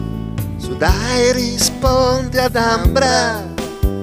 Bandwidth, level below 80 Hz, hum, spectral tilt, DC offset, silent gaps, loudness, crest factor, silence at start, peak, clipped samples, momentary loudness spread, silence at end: 16 kHz; -24 dBFS; none; -4 dB/octave; under 0.1%; none; -16 LUFS; 16 dB; 0 s; 0 dBFS; under 0.1%; 10 LU; 0 s